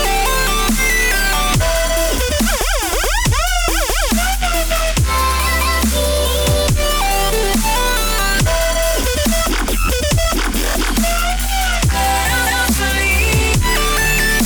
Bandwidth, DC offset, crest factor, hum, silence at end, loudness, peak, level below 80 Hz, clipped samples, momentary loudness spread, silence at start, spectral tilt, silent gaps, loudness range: over 20 kHz; under 0.1%; 10 dB; none; 0 s; -15 LUFS; -6 dBFS; -20 dBFS; under 0.1%; 3 LU; 0 s; -3 dB/octave; none; 1 LU